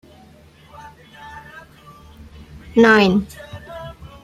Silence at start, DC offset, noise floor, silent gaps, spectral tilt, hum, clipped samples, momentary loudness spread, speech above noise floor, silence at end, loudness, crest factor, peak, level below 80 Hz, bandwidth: 1.25 s; under 0.1%; -47 dBFS; none; -6 dB/octave; none; under 0.1%; 27 LU; 31 dB; 0.35 s; -14 LUFS; 20 dB; 0 dBFS; -48 dBFS; 14 kHz